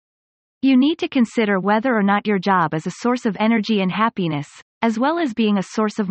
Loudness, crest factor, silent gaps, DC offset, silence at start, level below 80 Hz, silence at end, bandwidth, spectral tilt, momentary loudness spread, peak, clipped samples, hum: -19 LUFS; 16 dB; 4.62-4.81 s; under 0.1%; 0.65 s; -64 dBFS; 0 s; 8.6 kHz; -6 dB/octave; 6 LU; -4 dBFS; under 0.1%; none